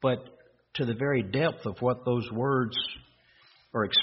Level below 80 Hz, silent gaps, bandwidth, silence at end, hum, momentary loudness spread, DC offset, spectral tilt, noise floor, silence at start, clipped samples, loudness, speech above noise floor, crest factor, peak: -62 dBFS; none; 5.8 kHz; 0 s; none; 9 LU; under 0.1%; -3.5 dB/octave; -61 dBFS; 0 s; under 0.1%; -29 LUFS; 33 dB; 16 dB; -12 dBFS